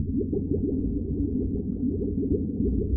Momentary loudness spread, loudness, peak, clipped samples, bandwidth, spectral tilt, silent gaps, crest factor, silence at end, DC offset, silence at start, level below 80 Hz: 2 LU; -28 LUFS; -12 dBFS; under 0.1%; 1 kHz; -20 dB/octave; none; 14 dB; 0 s; under 0.1%; 0 s; -34 dBFS